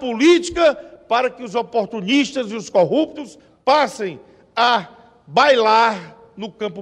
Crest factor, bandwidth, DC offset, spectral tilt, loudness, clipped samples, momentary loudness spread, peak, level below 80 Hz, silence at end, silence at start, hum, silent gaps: 18 dB; 11 kHz; under 0.1%; -4 dB/octave; -18 LUFS; under 0.1%; 14 LU; -2 dBFS; -54 dBFS; 0 s; 0 s; none; none